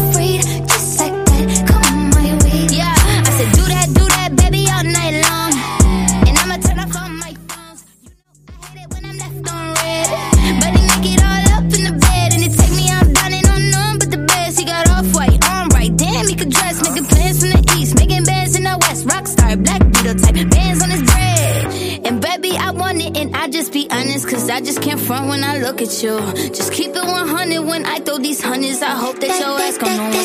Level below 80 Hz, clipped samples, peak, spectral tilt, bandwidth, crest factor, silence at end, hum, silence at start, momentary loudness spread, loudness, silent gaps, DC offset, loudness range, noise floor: -20 dBFS; under 0.1%; 0 dBFS; -4 dB/octave; 15.5 kHz; 14 dB; 0 s; none; 0 s; 7 LU; -14 LUFS; none; under 0.1%; 6 LU; -46 dBFS